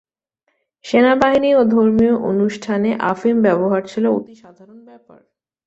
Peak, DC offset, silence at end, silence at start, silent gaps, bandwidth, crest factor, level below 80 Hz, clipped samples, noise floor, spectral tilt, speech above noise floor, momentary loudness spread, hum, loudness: -2 dBFS; under 0.1%; 0.9 s; 0.85 s; none; 8 kHz; 16 dB; -52 dBFS; under 0.1%; -71 dBFS; -7 dB/octave; 54 dB; 6 LU; none; -16 LUFS